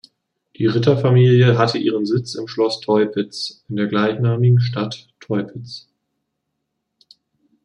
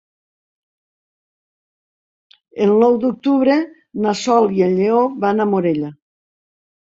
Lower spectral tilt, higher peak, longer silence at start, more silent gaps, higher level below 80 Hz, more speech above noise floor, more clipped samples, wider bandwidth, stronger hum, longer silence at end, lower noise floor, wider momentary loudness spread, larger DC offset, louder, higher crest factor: about the same, -7.5 dB/octave vs -6.5 dB/octave; about the same, -2 dBFS vs -2 dBFS; second, 0.6 s vs 2.55 s; neither; about the same, -62 dBFS vs -62 dBFS; second, 59 dB vs over 75 dB; neither; first, 9.8 kHz vs 7.8 kHz; neither; first, 1.85 s vs 0.9 s; second, -76 dBFS vs under -90 dBFS; first, 14 LU vs 9 LU; neither; about the same, -18 LUFS vs -16 LUFS; about the same, 16 dB vs 16 dB